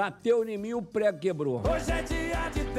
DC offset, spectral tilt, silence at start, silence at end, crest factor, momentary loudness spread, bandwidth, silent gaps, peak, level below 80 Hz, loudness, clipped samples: under 0.1%; -6 dB/octave; 0 s; 0 s; 12 dB; 5 LU; 15.5 kHz; none; -16 dBFS; -38 dBFS; -29 LUFS; under 0.1%